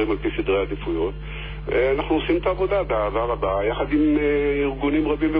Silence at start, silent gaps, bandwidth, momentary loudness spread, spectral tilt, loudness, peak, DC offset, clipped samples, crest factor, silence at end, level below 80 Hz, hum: 0 s; none; 5 kHz; 6 LU; -10 dB/octave; -22 LUFS; -10 dBFS; under 0.1%; under 0.1%; 12 dB; 0 s; -34 dBFS; none